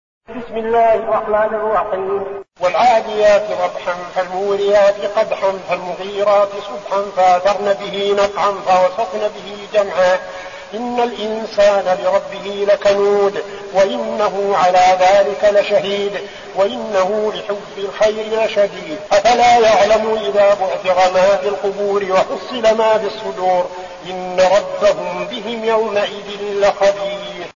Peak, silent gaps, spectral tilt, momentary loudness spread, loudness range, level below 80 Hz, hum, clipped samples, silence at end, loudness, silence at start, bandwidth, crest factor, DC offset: -2 dBFS; none; -3.5 dB/octave; 11 LU; 4 LU; -50 dBFS; none; under 0.1%; 0.05 s; -16 LUFS; 0.3 s; 7.4 kHz; 14 dB; 0.2%